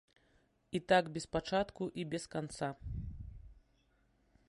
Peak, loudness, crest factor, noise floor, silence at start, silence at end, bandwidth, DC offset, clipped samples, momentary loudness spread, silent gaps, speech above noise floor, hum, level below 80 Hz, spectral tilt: -16 dBFS; -37 LUFS; 22 dB; -73 dBFS; 0.7 s; 0.95 s; 11.5 kHz; under 0.1%; under 0.1%; 15 LU; none; 37 dB; none; -54 dBFS; -5 dB/octave